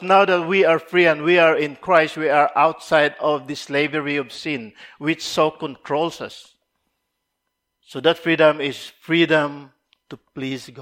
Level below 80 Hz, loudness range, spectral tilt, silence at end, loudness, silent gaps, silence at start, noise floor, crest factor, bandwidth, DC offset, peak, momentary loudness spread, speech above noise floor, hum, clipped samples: -66 dBFS; 9 LU; -5 dB/octave; 0 s; -19 LUFS; none; 0 s; -77 dBFS; 20 dB; 16 kHz; under 0.1%; 0 dBFS; 15 LU; 58 dB; none; under 0.1%